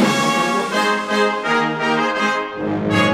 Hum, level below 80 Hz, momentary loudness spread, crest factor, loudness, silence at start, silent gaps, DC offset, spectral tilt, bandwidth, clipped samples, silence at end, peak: none; -54 dBFS; 4 LU; 14 dB; -18 LUFS; 0 s; none; under 0.1%; -4 dB/octave; 16 kHz; under 0.1%; 0 s; -4 dBFS